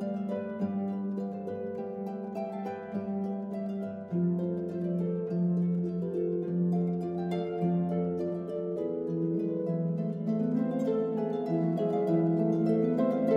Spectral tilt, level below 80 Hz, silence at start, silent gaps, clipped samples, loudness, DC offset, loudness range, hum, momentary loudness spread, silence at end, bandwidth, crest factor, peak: -10.5 dB/octave; -70 dBFS; 0 s; none; under 0.1%; -31 LUFS; under 0.1%; 6 LU; none; 9 LU; 0 s; 5.2 kHz; 16 dB; -14 dBFS